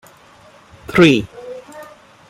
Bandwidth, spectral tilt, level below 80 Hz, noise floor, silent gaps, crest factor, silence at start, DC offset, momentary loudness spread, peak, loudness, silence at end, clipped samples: 15 kHz; -6 dB/octave; -48 dBFS; -46 dBFS; none; 18 dB; 0.9 s; under 0.1%; 26 LU; 0 dBFS; -13 LUFS; 0.45 s; under 0.1%